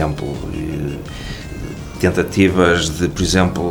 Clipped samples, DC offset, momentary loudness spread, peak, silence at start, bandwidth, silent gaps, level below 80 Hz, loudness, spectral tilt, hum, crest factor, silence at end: under 0.1%; 0.3%; 15 LU; -2 dBFS; 0 s; over 20 kHz; none; -32 dBFS; -17 LUFS; -5 dB/octave; none; 16 dB; 0 s